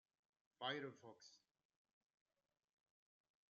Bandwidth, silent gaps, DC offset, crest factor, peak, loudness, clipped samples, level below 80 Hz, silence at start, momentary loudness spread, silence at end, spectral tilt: 7.2 kHz; none; under 0.1%; 26 dB; -32 dBFS; -49 LUFS; under 0.1%; under -90 dBFS; 0.6 s; 18 LU; 2.15 s; -1.5 dB/octave